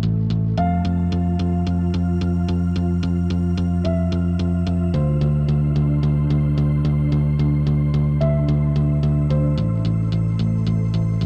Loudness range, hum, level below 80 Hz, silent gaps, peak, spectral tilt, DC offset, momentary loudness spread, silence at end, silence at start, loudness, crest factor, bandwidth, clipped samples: 2 LU; none; -30 dBFS; none; -8 dBFS; -9.5 dB/octave; under 0.1%; 2 LU; 0 s; 0 s; -20 LUFS; 10 dB; 6.4 kHz; under 0.1%